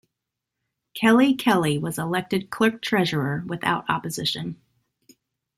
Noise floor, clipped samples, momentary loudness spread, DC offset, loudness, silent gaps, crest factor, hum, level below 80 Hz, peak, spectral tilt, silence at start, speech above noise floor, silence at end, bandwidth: -83 dBFS; under 0.1%; 10 LU; under 0.1%; -23 LUFS; none; 18 dB; none; -62 dBFS; -6 dBFS; -5 dB/octave; 0.95 s; 61 dB; 1.05 s; 15 kHz